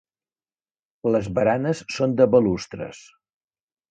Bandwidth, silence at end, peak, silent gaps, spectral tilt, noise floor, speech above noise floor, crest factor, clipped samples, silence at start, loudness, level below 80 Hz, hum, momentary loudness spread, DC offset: 9 kHz; 0.95 s; -4 dBFS; none; -6.5 dB/octave; under -90 dBFS; over 69 dB; 20 dB; under 0.1%; 1.05 s; -21 LUFS; -54 dBFS; none; 16 LU; under 0.1%